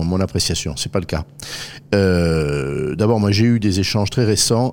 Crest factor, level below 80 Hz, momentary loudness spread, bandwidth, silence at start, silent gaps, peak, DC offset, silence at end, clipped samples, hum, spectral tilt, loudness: 16 dB; -38 dBFS; 11 LU; 17 kHz; 0 s; none; -2 dBFS; 0.4%; 0 s; under 0.1%; none; -5 dB/octave; -18 LUFS